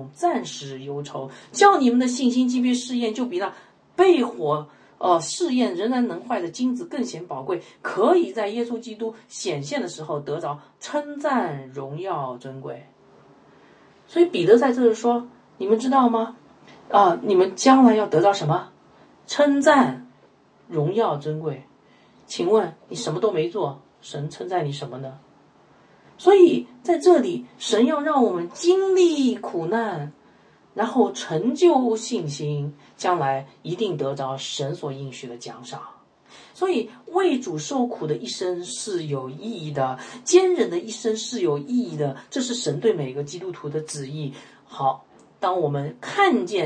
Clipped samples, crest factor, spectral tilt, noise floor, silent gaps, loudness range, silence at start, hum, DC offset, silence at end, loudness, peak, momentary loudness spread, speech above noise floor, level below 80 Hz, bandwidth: under 0.1%; 20 dB; -5 dB/octave; -56 dBFS; none; 9 LU; 0 s; none; under 0.1%; 0 s; -22 LUFS; -2 dBFS; 15 LU; 34 dB; -74 dBFS; 9.8 kHz